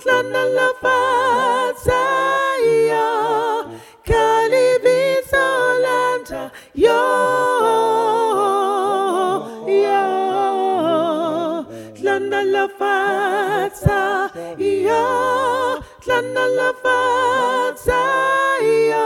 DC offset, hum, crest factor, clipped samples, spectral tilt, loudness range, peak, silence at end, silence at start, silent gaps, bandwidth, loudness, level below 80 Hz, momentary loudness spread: under 0.1%; none; 16 dB; under 0.1%; -4.5 dB/octave; 2 LU; 0 dBFS; 0 s; 0 s; none; 16.5 kHz; -17 LUFS; -42 dBFS; 6 LU